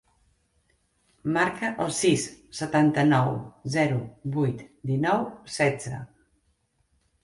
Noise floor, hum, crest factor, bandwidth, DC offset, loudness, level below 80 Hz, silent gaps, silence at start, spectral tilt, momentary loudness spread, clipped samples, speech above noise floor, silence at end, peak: -70 dBFS; none; 18 dB; 11.5 kHz; under 0.1%; -26 LUFS; -60 dBFS; none; 1.25 s; -5.5 dB/octave; 13 LU; under 0.1%; 45 dB; 1.15 s; -10 dBFS